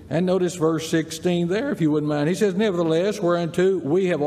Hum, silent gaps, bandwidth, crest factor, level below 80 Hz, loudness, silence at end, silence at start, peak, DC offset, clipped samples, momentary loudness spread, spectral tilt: none; none; 15 kHz; 12 dB; -60 dBFS; -22 LUFS; 0 s; 0 s; -8 dBFS; under 0.1%; under 0.1%; 3 LU; -6 dB/octave